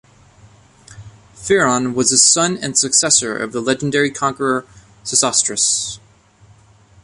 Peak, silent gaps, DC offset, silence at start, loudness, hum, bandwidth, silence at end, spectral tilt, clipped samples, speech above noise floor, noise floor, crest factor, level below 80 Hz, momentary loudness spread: 0 dBFS; none; under 0.1%; 0.9 s; -15 LUFS; none; 11.5 kHz; 1.05 s; -2 dB/octave; under 0.1%; 32 dB; -49 dBFS; 18 dB; -54 dBFS; 12 LU